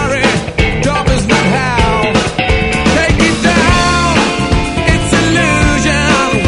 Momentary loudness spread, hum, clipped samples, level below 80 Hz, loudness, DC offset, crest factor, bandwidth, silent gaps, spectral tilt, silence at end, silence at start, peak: 3 LU; none; under 0.1%; -20 dBFS; -11 LUFS; under 0.1%; 10 dB; 11 kHz; none; -4.5 dB/octave; 0 s; 0 s; 0 dBFS